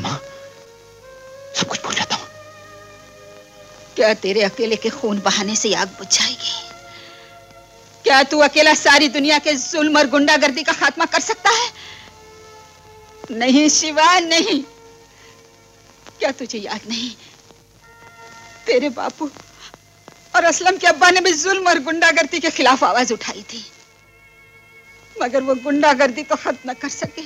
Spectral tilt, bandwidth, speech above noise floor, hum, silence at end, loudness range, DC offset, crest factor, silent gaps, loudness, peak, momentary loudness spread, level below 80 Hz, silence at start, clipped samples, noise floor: -1.5 dB/octave; 16 kHz; 33 dB; none; 0 s; 12 LU; under 0.1%; 18 dB; none; -16 LUFS; -2 dBFS; 16 LU; -60 dBFS; 0 s; under 0.1%; -49 dBFS